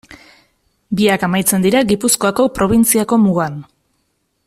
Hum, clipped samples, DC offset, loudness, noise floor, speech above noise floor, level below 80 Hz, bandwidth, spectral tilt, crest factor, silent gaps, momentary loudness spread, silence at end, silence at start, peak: none; under 0.1%; under 0.1%; -14 LUFS; -66 dBFS; 52 dB; -44 dBFS; 15.5 kHz; -4.5 dB/octave; 16 dB; none; 7 LU; 0.85 s; 0.1 s; 0 dBFS